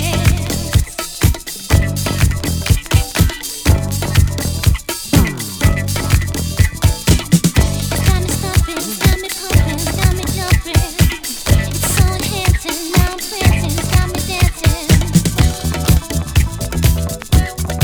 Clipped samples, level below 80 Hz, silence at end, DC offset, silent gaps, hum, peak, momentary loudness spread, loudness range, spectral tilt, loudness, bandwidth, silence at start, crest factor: under 0.1%; -20 dBFS; 0 s; under 0.1%; none; none; 0 dBFS; 4 LU; 1 LU; -4.5 dB/octave; -16 LUFS; over 20 kHz; 0 s; 14 dB